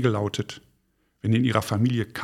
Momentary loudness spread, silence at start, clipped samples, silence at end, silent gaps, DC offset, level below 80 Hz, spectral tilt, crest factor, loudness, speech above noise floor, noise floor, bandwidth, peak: 12 LU; 0 s; under 0.1%; 0 s; none; under 0.1%; -60 dBFS; -6.5 dB/octave; 20 dB; -25 LUFS; 45 dB; -69 dBFS; 15 kHz; -4 dBFS